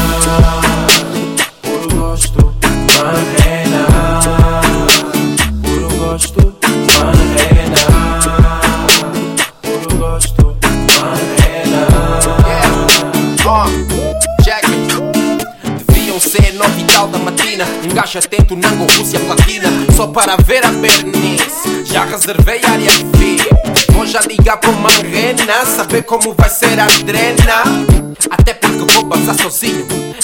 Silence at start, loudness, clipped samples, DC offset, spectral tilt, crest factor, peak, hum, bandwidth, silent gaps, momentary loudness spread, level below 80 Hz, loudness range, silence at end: 0 s; -10 LUFS; 0.6%; 0.4%; -3.5 dB/octave; 10 dB; 0 dBFS; none; over 20 kHz; none; 7 LU; -16 dBFS; 2 LU; 0 s